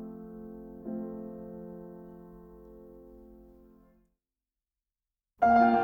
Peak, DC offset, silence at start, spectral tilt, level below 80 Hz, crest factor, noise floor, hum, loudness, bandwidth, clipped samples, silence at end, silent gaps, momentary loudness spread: -12 dBFS; under 0.1%; 0 s; -8 dB/octave; -60 dBFS; 22 dB; under -90 dBFS; none; -28 LUFS; 6.2 kHz; under 0.1%; 0 s; none; 28 LU